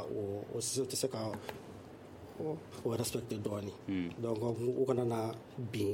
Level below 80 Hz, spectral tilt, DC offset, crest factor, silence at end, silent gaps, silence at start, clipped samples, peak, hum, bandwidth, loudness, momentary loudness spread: -68 dBFS; -5 dB/octave; under 0.1%; 18 dB; 0 s; none; 0 s; under 0.1%; -20 dBFS; none; 16.5 kHz; -37 LUFS; 15 LU